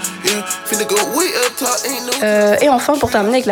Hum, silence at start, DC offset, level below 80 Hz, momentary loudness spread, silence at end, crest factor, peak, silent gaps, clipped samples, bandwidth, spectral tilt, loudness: none; 0 s; under 0.1%; -50 dBFS; 6 LU; 0 s; 14 dB; -2 dBFS; none; under 0.1%; 18 kHz; -2.5 dB/octave; -15 LUFS